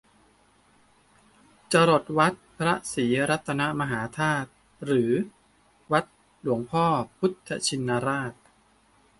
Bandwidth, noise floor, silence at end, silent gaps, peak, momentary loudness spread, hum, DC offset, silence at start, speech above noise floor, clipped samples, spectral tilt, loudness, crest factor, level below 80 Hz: 11.5 kHz; -62 dBFS; 0.85 s; none; -6 dBFS; 9 LU; none; under 0.1%; 1.7 s; 37 dB; under 0.1%; -5 dB/octave; -26 LUFS; 20 dB; -62 dBFS